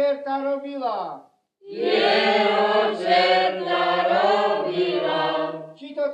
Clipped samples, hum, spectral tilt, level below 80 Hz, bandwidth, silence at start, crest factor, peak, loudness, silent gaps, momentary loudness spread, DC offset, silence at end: under 0.1%; none; -5 dB/octave; -82 dBFS; 9.4 kHz; 0 s; 16 dB; -6 dBFS; -21 LUFS; none; 12 LU; under 0.1%; 0 s